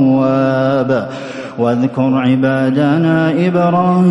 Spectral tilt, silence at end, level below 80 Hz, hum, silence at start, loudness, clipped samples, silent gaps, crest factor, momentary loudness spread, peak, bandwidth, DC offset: -8.5 dB/octave; 0 s; -54 dBFS; none; 0 s; -13 LUFS; under 0.1%; none; 10 dB; 6 LU; -2 dBFS; 10.5 kHz; under 0.1%